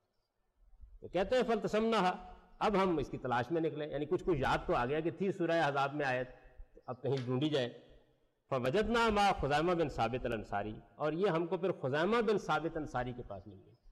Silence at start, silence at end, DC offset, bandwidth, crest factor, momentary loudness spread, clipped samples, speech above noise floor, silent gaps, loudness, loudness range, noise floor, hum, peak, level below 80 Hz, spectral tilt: 0.8 s; 0 s; under 0.1%; 13 kHz; 10 dB; 9 LU; under 0.1%; 46 dB; none; -34 LUFS; 2 LU; -80 dBFS; none; -24 dBFS; -54 dBFS; -6 dB/octave